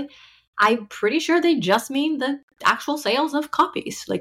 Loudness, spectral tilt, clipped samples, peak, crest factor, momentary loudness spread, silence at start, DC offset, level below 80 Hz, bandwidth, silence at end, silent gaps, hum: -21 LUFS; -4 dB/octave; under 0.1%; -6 dBFS; 16 dB; 9 LU; 0 s; under 0.1%; -64 dBFS; 16 kHz; 0 s; 0.47-0.53 s, 2.43-2.48 s; none